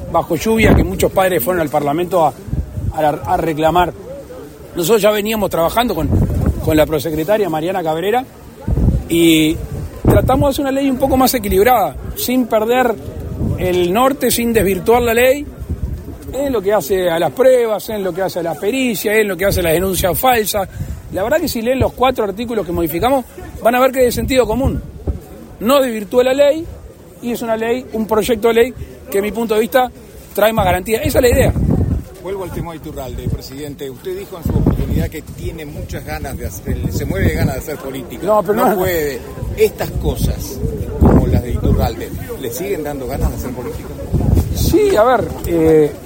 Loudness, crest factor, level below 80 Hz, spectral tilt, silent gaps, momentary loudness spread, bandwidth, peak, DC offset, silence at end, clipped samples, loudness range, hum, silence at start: -16 LUFS; 16 dB; -28 dBFS; -5.5 dB/octave; none; 14 LU; 16.5 kHz; 0 dBFS; under 0.1%; 0 s; under 0.1%; 5 LU; none; 0 s